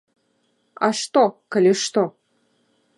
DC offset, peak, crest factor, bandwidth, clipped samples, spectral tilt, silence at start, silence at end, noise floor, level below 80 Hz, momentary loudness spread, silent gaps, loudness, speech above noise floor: under 0.1%; -4 dBFS; 18 dB; 11.5 kHz; under 0.1%; -4 dB/octave; 0.8 s; 0.9 s; -67 dBFS; -74 dBFS; 6 LU; none; -20 LUFS; 48 dB